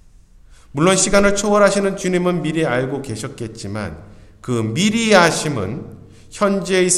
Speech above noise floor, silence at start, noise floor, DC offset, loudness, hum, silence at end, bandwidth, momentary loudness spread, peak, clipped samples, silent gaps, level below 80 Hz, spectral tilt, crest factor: 29 dB; 0.75 s; -46 dBFS; under 0.1%; -17 LUFS; none; 0 s; 14 kHz; 17 LU; 0 dBFS; under 0.1%; none; -42 dBFS; -4 dB/octave; 18 dB